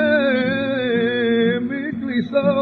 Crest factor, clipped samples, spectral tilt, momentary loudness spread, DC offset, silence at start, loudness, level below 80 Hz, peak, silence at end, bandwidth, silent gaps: 14 dB; under 0.1%; -8.5 dB/octave; 6 LU; under 0.1%; 0 s; -19 LUFS; -58 dBFS; -4 dBFS; 0 s; 4.8 kHz; none